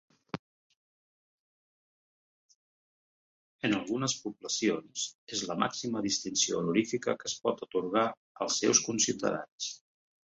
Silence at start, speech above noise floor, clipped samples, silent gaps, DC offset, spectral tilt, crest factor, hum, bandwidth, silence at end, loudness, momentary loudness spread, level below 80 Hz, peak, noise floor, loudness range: 0.35 s; over 59 dB; under 0.1%; 0.39-0.70 s, 0.76-2.49 s, 2.56-3.59 s, 5.15-5.27 s, 8.17-8.35 s, 9.52-9.58 s; under 0.1%; -2.5 dB/octave; 24 dB; none; 8.4 kHz; 0.6 s; -31 LUFS; 12 LU; -72 dBFS; -10 dBFS; under -90 dBFS; 8 LU